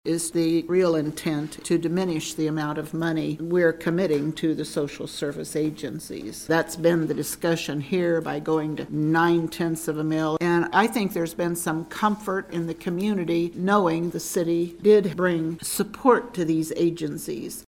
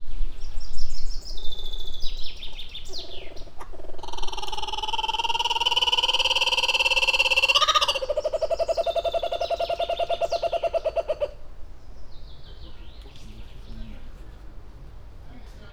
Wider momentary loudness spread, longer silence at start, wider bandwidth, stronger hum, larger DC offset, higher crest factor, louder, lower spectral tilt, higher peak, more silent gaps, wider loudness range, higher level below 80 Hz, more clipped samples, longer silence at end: second, 8 LU vs 25 LU; about the same, 0.05 s vs 0 s; first, 17 kHz vs 12.5 kHz; neither; neither; about the same, 20 dB vs 16 dB; about the same, -24 LUFS vs -23 LUFS; first, -5.5 dB/octave vs -1.5 dB/octave; about the same, -4 dBFS vs -6 dBFS; neither; second, 3 LU vs 17 LU; second, -58 dBFS vs -34 dBFS; neither; about the same, 0.05 s vs 0 s